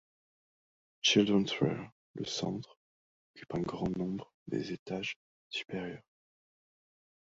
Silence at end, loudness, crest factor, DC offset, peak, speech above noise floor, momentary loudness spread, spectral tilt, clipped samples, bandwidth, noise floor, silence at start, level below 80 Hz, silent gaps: 1.2 s; -34 LUFS; 22 dB; under 0.1%; -14 dBFS; over 57 dB; 16 LU; -4 dB/octave; under 0.1%; 7.6 kHz; under -90 dBFS; 1.05 s; -66 dBFS; 1.92-2.14 s, 2.77-3.34 s, 4.34-4.46 s, 4.79-4.86 s, 5.16-5.50 s